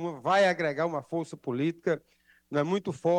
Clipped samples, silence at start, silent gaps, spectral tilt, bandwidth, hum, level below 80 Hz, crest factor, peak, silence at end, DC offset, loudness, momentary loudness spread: under 0.1%; 0 s; none; -6 dB/octave; 11.5 kHz; none; -74 dBFS; 16 dB; -14 dBFS; 0 s; under 0.1%; -29 LUFS; 10 LU